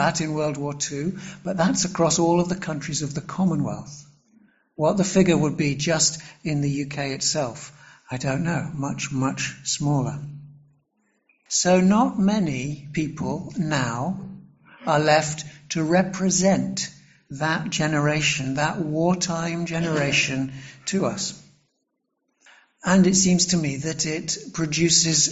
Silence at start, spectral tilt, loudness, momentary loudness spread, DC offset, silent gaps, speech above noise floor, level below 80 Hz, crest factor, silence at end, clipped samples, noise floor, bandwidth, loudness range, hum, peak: 0 s; -4 dB/octave; -23 LUFS; 12 LU; under 0.1%; none; 53 dB; -54 dBFS; 18 dB; 0 s; under 0.1%; -76 dBFS; 8.2 kHz; 4 LU; none; -4 dBFS